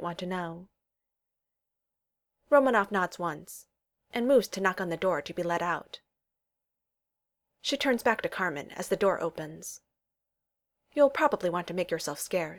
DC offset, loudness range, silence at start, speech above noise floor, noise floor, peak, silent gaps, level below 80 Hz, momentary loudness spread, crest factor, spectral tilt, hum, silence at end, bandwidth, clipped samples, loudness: under 0.1%; 4 LU; 0 s; 58 dB; -87 dBFS; -10 dBFS; none; -68 dBFS; 17 LU; 22 dB; -4.5 dB/octave; none; 0 s; 19 kHz; under 0.1%; -29 LUFS